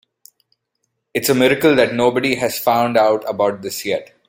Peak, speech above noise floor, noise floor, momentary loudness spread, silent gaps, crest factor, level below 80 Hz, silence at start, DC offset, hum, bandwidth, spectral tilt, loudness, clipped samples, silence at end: 0 dBFS; 56 dB; -73 dBFS; 9 LU; none; 18 dB; -58 dBFS; 1.15 s; under 0.1%; none; 17 kHz; -4 dB/octave; -17 LUFS; under 0.1%; 0.25 s